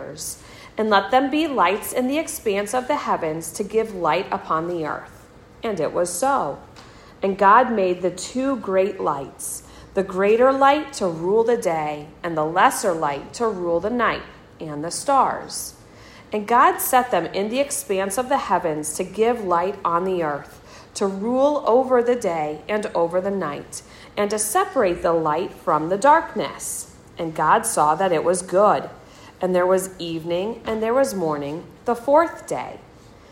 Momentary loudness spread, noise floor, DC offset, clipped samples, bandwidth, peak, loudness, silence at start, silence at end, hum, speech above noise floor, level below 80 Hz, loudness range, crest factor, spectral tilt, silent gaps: 13 LU; -46 dBFS; under 0.1%; under 0.1%; 16 kHz; -2 dBFS; -21 LUFS; 0 s; 0.5 s; none; 25 dB; -54 dBFS; 3 LU; 18 dB; -4 dB/octave; none